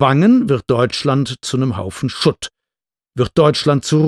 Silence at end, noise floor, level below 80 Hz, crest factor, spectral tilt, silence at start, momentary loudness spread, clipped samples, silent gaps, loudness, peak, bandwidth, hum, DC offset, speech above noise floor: 0 s; -89 dBFS; -48 dBFS; 14 dB; -6 dB/octave; 0 s; 11 LU; under 0.1%; none; -16 LUFS; 0 dBFS; 12.5 kHz; none; under 0.1%; 74 dB